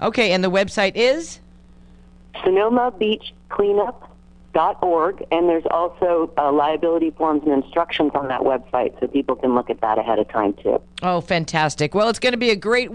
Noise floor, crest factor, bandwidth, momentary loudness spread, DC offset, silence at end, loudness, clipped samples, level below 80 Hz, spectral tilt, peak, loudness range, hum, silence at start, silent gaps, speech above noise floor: -46 dBFS; 18 dB; 11 kHz; 5 LU; under 0.1%; 0 s; -20 LUFS; under 0.1%; -50 dBFS; -5 dB/octave; -2 dBFS; 2 LU; none; 0 s; none; 27 dB